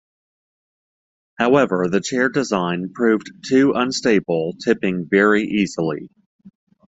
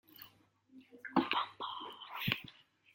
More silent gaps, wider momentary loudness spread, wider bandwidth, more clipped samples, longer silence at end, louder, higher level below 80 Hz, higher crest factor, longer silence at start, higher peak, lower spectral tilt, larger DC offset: first, 6.26-6.39 s vs none; second, 7 LU vs 21 LU; second, 8 kHz vs 16.5 kHz; neither; about the same, 0.5 s vs 0.45 s; first, -19 LUFS vs -38 LUFS; first, -58 dBFS vs -76 dBFS; second, 18 dB vs 28 dB; first, 1.4 s vs 0.15 s; first, -2 dBFS vs -12 dBFS; about the same, -5.5 dB/octave vs -5.5 dB/octave; neither